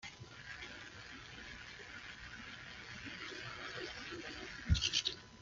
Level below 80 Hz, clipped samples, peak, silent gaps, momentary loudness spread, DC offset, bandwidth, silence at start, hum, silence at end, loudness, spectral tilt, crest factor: -52 dBFS; under 0.1%; -20 dBFS; none; 15 LU; under 0.1%; 7.6 kHz; 0 s; none; 0 s; -43 LUFS; -3 dB/octave; 24 dB